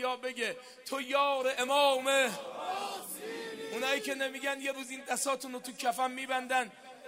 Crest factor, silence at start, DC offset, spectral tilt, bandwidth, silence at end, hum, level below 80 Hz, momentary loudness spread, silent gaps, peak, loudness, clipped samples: 20 dB; 0 s; under 0.1%; -1 dB/octave; 16 kHz; 0 s; none; -90 dBFS; 13 LU; none; -14 dBFS; -32 LUFS; under 0.1%